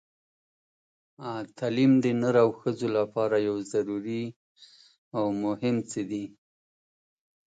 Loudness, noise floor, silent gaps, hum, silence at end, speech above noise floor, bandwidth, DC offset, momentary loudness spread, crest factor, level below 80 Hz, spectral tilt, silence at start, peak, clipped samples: -27 LUFS; under -90 dBFS; 4.36-4.56 s, 4.98-5.11 s; none; 1.15 s; over 64 dB; 9.2 kHz; under 0.1%; 14 LU; 18 dB; -72 dBFS; -7 dB/octave; 1.2 s; -10 dBFS; under 0.1%